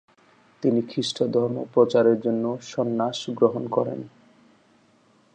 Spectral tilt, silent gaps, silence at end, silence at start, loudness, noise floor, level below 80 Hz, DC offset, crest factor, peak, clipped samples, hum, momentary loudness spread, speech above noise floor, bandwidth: -6 dB/octave; none; 1.25 s; 0.6 s; -24 LUFS; -60 dBFS; -72 dBFS; under 0.1%; 18 dB; -6 dBFS; under 0.1%; none; 8 LU; 37 dB; 9.2 kHz